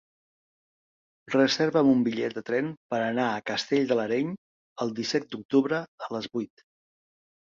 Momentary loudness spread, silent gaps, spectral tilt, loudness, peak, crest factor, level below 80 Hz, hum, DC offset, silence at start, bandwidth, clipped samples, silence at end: 11 LU; 2.77-2.89 s, 4.38-4.76 s, 5.45-5.49 s, 5.88-5.98 s; -5 dB/octave; -27 LUFS; -8 dBFS; 20 dB; -70 dBFS; none; under 0.1%; 1.3 s; 7.4 kHz; under 0.1%; 1.1 s